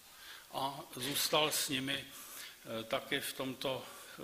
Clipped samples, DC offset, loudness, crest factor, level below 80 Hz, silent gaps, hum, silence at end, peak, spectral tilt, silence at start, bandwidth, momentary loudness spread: under 0.1%; under 0.1%; -36 LUFS; 22 dB; -74 dBFS; none; none; 0 s; -16 dBFS; -2 dB/octave; 0 s; 15.5 kHz; 16 LU